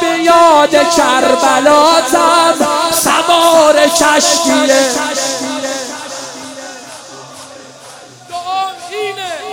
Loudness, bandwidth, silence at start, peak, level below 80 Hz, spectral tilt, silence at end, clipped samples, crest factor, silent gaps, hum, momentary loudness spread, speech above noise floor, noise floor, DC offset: -10 LUFS; 18 kHz; 0 s; 0 dBFS; -50 dBFS; -1.5 dB/octave; 0 s; 0.2%; 12 dB; none; none; 20 LU; 25 dB; -35 dBFS; under 0.1%